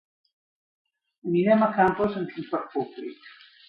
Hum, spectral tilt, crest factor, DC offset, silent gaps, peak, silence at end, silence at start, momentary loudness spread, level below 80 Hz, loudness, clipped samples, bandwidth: none; -9.5 dB/octave; 20 dB; under 0.1%; none; -6 dBFS; 0.4 s; 1.25 s; 17 LU; -62 dBFS; -25 LUFS; under 0.1%; 5.4 kHz